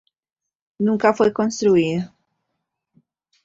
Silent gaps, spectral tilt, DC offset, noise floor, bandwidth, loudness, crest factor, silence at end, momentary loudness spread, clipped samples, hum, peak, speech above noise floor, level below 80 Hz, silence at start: none; -6 dB/octave; under 0.1%; -78 dBFS; 7.8 kHz; -19 LUFS; 20 dB; 1.4 s; 9 LU; under 0.1%; none; -2 dBFS; 60 dB; -62 dBFS; 0.8 s